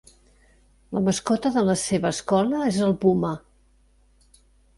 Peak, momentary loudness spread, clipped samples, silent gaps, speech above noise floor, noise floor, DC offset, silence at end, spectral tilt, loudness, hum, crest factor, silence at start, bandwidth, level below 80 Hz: -8 dBFS; 6 LU; under 0.1%; none; 37 dB; -59 dBFS; under 0.1%; 1.4 s; -5.5 dB/octave; -23 LUFS; none; 18 dB; 0.9 s; 11.5 kHz; -54 dBFS